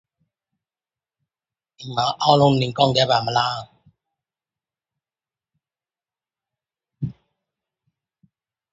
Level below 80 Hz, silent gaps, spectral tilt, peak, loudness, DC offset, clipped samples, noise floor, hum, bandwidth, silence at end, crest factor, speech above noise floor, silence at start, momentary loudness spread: -58 dBFS; none; -5.5 dB/octave; 0 dBFS; -19 LUFS; under 0.1%; under 0.1%; under -90 dBFS; none; 8 kHz; 1.6 s; 24 dB; over 71 dB; 1.8 s; 16 LU